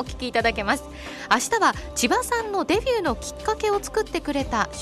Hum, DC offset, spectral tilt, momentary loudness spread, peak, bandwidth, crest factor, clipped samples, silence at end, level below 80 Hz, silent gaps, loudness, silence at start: none; under 0.1%; -3 dB/octave; 6 LU; -6 dBFS; 13 kHz; 18 dB; under 0.1%; 0 s; -40 dBFS; none; -23 LUFS; 0 s